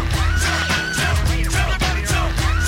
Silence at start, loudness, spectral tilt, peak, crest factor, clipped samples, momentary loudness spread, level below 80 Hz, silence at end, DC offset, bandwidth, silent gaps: 0 s; -19 LUFS; -3.5 dB/octave; -8 dBFS; 12 dB; under 0.1%; 1 LU; -22 dBFS; 0 s; under 0.1%; 16.5 kHz; none